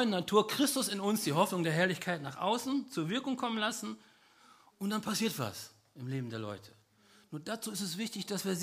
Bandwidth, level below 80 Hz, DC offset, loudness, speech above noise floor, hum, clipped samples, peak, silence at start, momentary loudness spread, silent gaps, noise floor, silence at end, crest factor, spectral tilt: 15.5 kHz; -78 dBFS; under 0.1%; -34 LUFS; 31 dB; none; under 0.1%; -12 dBFS; 0 s; 14 LU; none; -65 dBFS; 0 s; 22 dB; -4 dB/octave